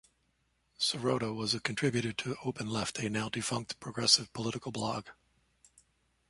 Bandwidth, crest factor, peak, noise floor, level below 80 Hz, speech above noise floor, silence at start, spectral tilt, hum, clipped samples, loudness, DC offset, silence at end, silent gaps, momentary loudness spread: 11.5 kHz; 24 dB; -10 dBFS; -75 dBFS; -66 dBFS; 42 dB; 0.8 s; -3.5 dB/octave; none; under 0.1%; -32 LUFS; under 0.1%; 1.15 s; none; 11 LU